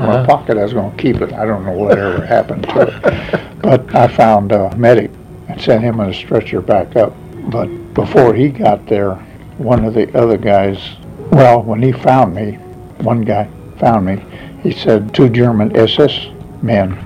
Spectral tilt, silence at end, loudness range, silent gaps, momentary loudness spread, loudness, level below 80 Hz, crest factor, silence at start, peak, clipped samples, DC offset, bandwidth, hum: -8 dB/octave; 0 s; 3 LU; none; 12 LU; -13 LUFS; -38 dBFS; 12 dB; 0 s; 0 dBFS; 0.3%; under 0.1%; 14.5 kHz; none